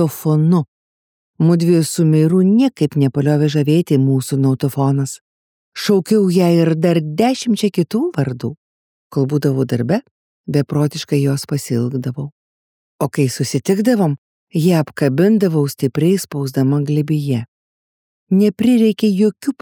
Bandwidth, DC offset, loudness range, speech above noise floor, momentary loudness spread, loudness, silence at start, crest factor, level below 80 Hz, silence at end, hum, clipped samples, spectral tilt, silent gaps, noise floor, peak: 18.5 kHz; under 0.1%; 5 LU; over 75 dB; 9 LU; -16 LUFS; 0 s; 14 dB; -64 dBFS; 0.1 s; none; under 0.1%; -7 dB/octave; 0.68-1.34 s, 5.21-5.72 s, 8.57-9.10 s, 10.11-10.44 s, 12.32-12.99 s, 14.18-14.47 s, 17.48-18.27 s; under -90 dBFS; -2 dBFS